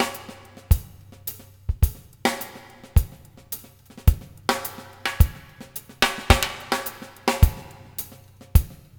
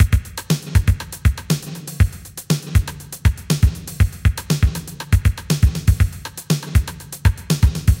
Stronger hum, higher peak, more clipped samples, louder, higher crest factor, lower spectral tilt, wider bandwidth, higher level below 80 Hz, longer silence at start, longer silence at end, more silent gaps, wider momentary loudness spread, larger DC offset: neither; about the same, 0 dBFS vs -2 dBFS; neither; second, -25 LUFS vs -20 LUFS; first, 24 dB vs 16 dB; about the same, -4.5 dB/octave vs -5.5 dB/octave; first, over 20 kHz vs 17 kHz; second, -28 dBFS vs -22 dBFS; about the same, 0 s vs 0 s; first, 0.3 s vs 0 s; neither; first, 17 LU vs 5 LU; neither